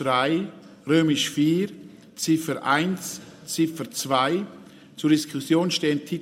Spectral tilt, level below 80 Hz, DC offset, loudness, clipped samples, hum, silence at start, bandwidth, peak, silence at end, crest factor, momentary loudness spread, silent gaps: -4.5 dB/octave; -70 dBFS; under 0.1%; -24 LUFS; under 0.1%; none; 0 s; 16 kHz; -6 dBFS; 0 s; 18 dB; 15 LU; none